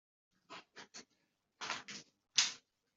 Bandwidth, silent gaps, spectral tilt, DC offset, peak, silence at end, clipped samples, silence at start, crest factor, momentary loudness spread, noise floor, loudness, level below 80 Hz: 8.2 kHz; none; 1.5 dB/octave; under 0.1%; -14 dBFS; 0.35 s; under 0.1%; 0.5 s; 32 dB; 22 LU; -81 dBFS; -37 LUFS; under -90 dBFS